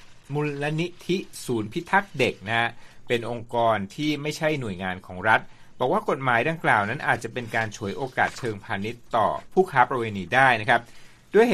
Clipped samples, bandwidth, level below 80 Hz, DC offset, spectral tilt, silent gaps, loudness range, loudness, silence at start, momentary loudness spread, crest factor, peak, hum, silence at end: under 0.1%; 15 kHz; -56 dBFS; under 0.1%; -5.5 dB/octave; none; 3 LU; -25 LUFS; 0 s; 9 LU; 22 dB; -2 dBFS; none; 0 s